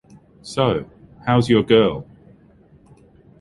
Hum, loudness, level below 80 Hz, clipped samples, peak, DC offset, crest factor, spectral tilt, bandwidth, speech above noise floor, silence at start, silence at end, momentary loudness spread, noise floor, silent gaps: none; -19 LUFS; -48 dBFS; under 0.1%; -2 dBFS; under 0.1%; 18 dB; -6.5 dB/octave; 11.5 kHz; 34 dB; 0.45 s; 1.35 s; 20 LU; -51 dBFS; none